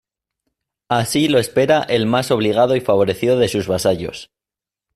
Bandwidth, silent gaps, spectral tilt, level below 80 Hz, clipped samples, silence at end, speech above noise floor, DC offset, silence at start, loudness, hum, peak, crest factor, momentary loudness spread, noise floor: 15.5 kHz; none; -5 dB/octave; -52 dBFS; under 0.1%; 0.7 s; 72 dB; under 0.1%; 0.9 s; -17 LUFS; none; -2 dBFS; 16 dB; 5 LU; -89 dBFS